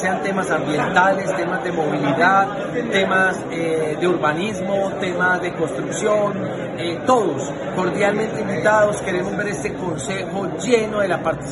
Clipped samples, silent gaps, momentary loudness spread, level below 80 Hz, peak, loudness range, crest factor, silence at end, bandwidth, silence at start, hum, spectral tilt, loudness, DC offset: under 0.1%; none; 8 LU; -50 dBFS; -2 dBFS; 2 LU; 18 dB; 0 s; 11.5 kHz; 0 s; none; -5 dB/octave; -20 LUFS; under 0.1%